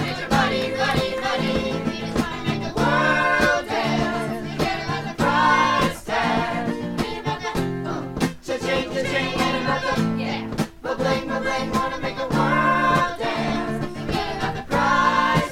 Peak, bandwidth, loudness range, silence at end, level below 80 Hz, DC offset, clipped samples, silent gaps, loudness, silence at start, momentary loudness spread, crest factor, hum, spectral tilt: -4 dBFS; 16.5 kHz; 3 LU; 0 s; -42 dBFS; under 0.1%; under 0.1%; none; -22 LUFS; 0 s; 9 LU; 18 dB; none; -5 dB/octave